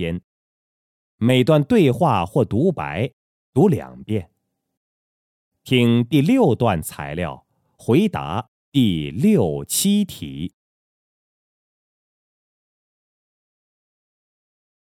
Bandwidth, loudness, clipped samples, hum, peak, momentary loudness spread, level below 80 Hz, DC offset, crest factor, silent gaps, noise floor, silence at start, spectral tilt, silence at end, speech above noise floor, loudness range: 17.5 kHz; -19 LUFS; under 0.1%; none; -4 dBFS; 13 LU; -50 dBFS; under 0.1%; 18 dB; 0.24-1.18 s, 3.13-3.53 s, 4.77-5.51 s, 8.48-8.72 s; under -90 dBFS; 0 s; -6 dB/octave; 4.35 s; over 72 dB; 6 LU